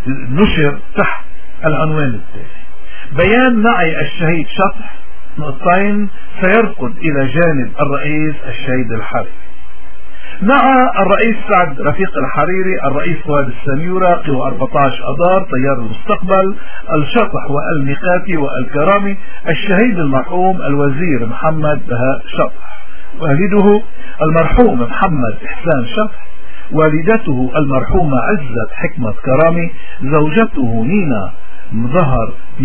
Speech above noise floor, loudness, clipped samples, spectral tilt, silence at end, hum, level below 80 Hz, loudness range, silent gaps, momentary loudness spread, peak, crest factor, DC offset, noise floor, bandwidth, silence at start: 26 dB; -14 LUFS; under 0.1%; -10.5 dB/octave; 0 s; none; -32 dBFS; 2 LU; none; 10 LU; 0 dBFS; 16 dB; 30%; -39 dBFS; 4 kHz; 0 s